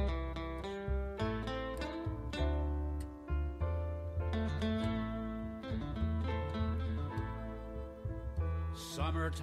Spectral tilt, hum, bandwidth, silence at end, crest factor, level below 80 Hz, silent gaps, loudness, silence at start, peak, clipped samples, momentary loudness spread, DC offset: -7 dB/octave; none; 12.5 kHz; 0 s; 14 dB; -42 dBFS; none; -39 LUFS; 0 s; -24 dBFS; under 0.1%; 7 LU; under 0.1%